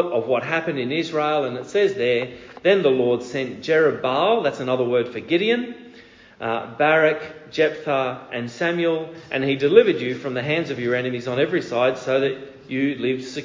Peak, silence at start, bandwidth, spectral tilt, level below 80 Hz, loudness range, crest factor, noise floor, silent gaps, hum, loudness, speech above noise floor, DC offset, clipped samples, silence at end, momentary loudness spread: 0 dBFS; 0 s; 7.6 kHz; -6 dB/octave; -62 dBFS; 2 LU; 20 dB; -47 dBFS; none; none; -21 LUFS; 26 dB; under 0.1%; under 0.1%; 0 s; 10 LU